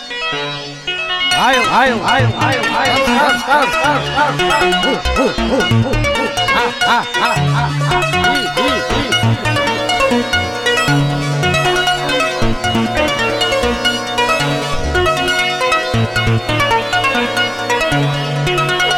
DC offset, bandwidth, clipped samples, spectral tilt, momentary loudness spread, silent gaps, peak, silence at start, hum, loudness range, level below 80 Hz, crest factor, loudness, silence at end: under 0.1%; 17 kHz; under 0.1%; -4 dB/octave; 4 LU; none; 0 dBFS; 0 s; none; 2 LU; -30 dBFS; 14 dB; -14 LUFS; 0 s